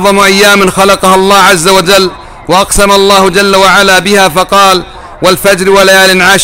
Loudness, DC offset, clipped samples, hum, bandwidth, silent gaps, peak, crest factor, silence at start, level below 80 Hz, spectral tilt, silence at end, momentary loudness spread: -4 LUFS; 0.9%; 2%; none; over 20 kHz; none; 0 dBFS; 6 dB; 0 s; -28 dBFS; -3 dB/octave; 0 s; 6 LU